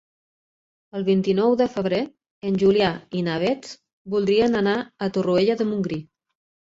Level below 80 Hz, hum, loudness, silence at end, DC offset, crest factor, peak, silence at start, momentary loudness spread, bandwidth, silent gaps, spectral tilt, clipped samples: -58 dBFS; none; -22 LUFS; 0.7 s; under 0.1%; 16 dB; -6 dBFS; 0.95 s; 13 LU; 7.8 kHz; 2.31-2.41 s, 3.93-4.05 s; -7 dB/octave; under 0.1%